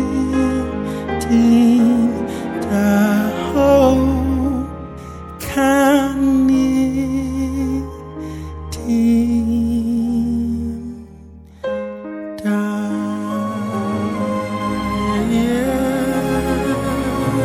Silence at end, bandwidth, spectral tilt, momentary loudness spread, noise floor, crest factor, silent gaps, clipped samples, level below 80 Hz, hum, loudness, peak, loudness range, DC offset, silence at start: 0 s; 16 kHz; -6.5 dB/octave; 16 LU; -39 dBFS; 16 dB; none; under 0.1%; -34 dBFS; none; -17 LUFS; -2 dBFS; 7 LU; under 0.1%; 0 s